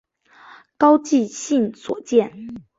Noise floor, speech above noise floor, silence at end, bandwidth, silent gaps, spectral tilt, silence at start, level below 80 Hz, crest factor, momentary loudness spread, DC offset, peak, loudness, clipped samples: -48 dBFS; 29 dB; 0.2 s; 7.8 kHz; none; -5 dB/octave; 0.8 s; -64 dBFS; 20 dB; 14 LU; under 0.1%; 0 dBFS; -19 LUFS; under 0.1%